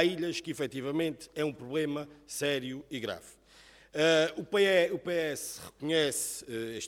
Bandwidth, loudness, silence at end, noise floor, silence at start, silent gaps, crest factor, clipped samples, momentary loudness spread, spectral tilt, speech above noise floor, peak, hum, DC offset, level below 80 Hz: 17 kHz; -31 LUFS; 0 s; -58 dBFS; 0 s; none; 20 dB; under 0.1%; 14 LU; -3.5 dB/octave; 27 dB; -10 dBFS; none; under 0.1%; -68 dBFS